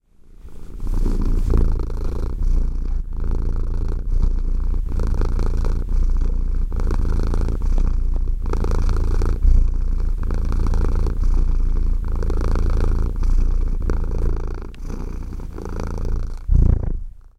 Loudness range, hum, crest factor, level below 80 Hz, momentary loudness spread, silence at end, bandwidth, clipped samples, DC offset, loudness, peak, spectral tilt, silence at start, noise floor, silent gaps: 3 LU; none; 14 dB; -18 dBFS; 8 LU; 0.2 s; 6.2 kHz; under 0.1%; under 0.1%; -24 LUFS; -4 dBFS; -8 dB/octave; 0.2 s; -40 dBFS; none